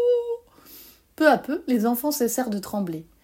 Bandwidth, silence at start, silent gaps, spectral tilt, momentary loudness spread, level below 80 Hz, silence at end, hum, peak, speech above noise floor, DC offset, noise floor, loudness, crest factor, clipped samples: 16.5 kHz; 0 s; none; -4.5 dB/octave; 14 LU; -62 dBFS; 0.2 s; none; -4 dBFS; 26 dB; under 0.1%; -49 dBFS; -24 LUFS; 20 dB; under 0.1%